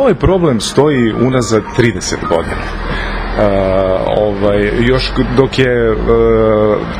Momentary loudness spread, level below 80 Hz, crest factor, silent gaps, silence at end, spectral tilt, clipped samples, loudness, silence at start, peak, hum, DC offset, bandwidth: 7 LU; -24 dBFS; 12 dB; none; 0 s; -6 dB/octave; 0.1%; -12 LUFS; 0 s; 0 dBFS; none; under 0.1%; 14 kHz